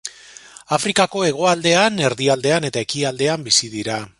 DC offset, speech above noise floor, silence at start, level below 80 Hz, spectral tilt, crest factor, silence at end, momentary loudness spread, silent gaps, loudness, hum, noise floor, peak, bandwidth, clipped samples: under 0.1%; 24 dB; 0.05 s; -58 dBFS; -3 dB/octave; 18 dB; 0.1 s; 8 LU; none; -18 LUFS; none; -42 dBFS; 0 dBFS; 11.5 kHz; under 0.1%